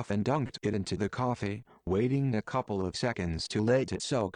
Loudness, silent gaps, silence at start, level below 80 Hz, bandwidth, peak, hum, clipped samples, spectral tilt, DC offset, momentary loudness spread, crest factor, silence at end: -31 LUFS; none; 0 s; -54 dBFS; 10.5 kHz; -16 dBFS; none; under 0.1%; -6 dB/octave; under 0.1%; 6 LU; 16 dB; 0.05 s